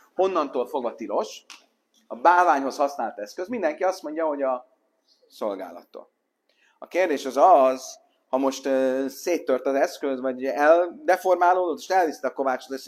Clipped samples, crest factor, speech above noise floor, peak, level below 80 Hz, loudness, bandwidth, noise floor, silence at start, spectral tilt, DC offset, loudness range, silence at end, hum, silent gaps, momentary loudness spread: under 0.1%; 20 dB; 45 dB; -4 dBFS; -78 dBFS; -23 LUFS; 15 kHz; -68 dBFS; 0.2 s; -3 dB/octave; under 0.1%; 7 LU; 0 s; none; none; 13 LU